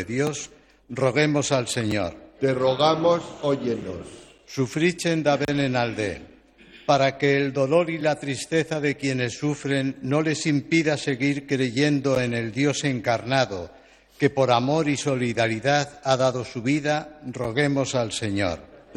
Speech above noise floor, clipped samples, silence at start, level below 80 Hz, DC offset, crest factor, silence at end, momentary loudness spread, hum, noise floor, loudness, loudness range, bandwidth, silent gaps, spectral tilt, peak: 27 dB; under 0.1%; 0 s; -58 dBFS; under 0.1%; 18 dB; 0.15 s; 8 LU; none; -50 dBFS; -23 LUFS; 1 LU; 13.5 kHz; none; -5 dB/octave; -6 dBFS